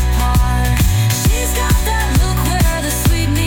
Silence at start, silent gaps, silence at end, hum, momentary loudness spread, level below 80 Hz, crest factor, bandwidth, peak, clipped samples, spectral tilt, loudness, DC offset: 0 s; none; 0 s; none; 2 LU; -16 dBFS; 10 dB; 18 kHz; -2 dBFS; under 0.1%; -4.5 dB/octave; -15 LUFS; under 0.1%